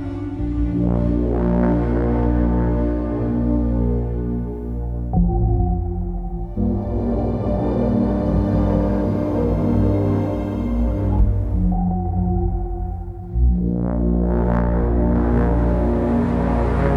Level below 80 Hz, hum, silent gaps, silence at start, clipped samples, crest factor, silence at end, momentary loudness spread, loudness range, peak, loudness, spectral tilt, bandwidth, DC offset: -22 dBFS; none; none; 0 s; under 0.1%; 14 dB; 0 s; 7 LU; 3 LU; -4 dBFS; -20 LUFS; -11 dB/octave; 4.4 kHz; under 0.1%